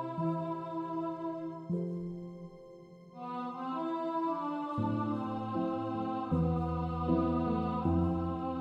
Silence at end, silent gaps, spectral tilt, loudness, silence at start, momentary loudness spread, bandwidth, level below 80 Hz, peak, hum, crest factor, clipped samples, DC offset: 0 s; none; -10 dB/octave; -35 LUFS; 0 s; 13 LU; 5.6 kHz; -52 dBFS; -18 dBFS; none; 16 dB; under 0.1%; under 0.1%